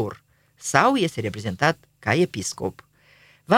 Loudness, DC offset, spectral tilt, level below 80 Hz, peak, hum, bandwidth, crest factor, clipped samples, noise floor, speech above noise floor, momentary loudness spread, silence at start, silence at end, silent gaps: -23 LUFS; under 0.1%; -4.5 dB/octave; -60 dBFS; 0 dBFS; 50 Hz at -50 dBFS; 16.5 kHz; 22 dB; under 0.1%; -56 dBFS; 33 dB; 13 LU; 0 s; 0 s; none